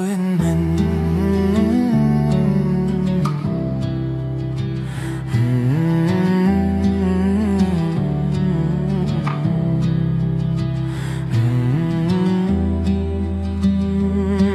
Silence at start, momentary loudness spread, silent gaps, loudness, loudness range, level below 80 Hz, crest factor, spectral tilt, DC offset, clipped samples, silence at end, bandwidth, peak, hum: 0 s; 6 LU; none; -19 LUFS; 3 LU; -32 dBFS; 14 dB; -8.5 dB/octave; under 0.1%; under 0.1%; 0 s; 12.5 kHz; -4 dBFS; none